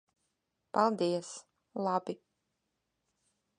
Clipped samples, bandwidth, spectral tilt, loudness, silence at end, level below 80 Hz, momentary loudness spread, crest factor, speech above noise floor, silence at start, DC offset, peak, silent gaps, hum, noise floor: under 0.1%; 10.5 kHz; -5.5 dB/octave; -33 LUFS; 1.45 s; -84 dBFS; 17 LU; 24 dB; 51 dB; 0.75 s; under 0.1%; -14 dBFS; none; none; -83 dBFS